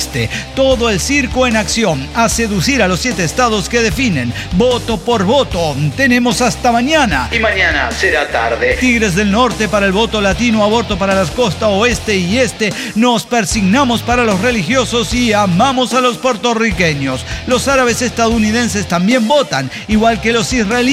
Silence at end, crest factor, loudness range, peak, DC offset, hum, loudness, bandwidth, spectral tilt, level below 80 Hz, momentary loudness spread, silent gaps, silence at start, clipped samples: 0 s; 12 dB; 1 LU; -2 dBFS; under 0.1%; none; -13 LUFS; 16 kHz; -4 dB/octave; -30 dBFS; 4 LU; none; 0 s; under 0.1%